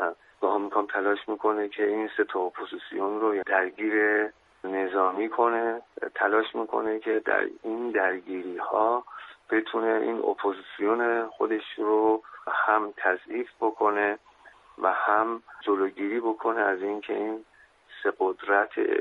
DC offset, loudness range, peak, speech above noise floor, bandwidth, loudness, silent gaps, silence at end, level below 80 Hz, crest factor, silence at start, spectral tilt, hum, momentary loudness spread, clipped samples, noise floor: under 0.1%; 2 LU; -8 dBFS; 28 dB; 4.1 kHz; -27 LUFS; none; 0 s; -74 dBFS; 20 dB; 0 s; -6.5 dB/octave; none; 8 LU; under 0.1%; -54 dBFS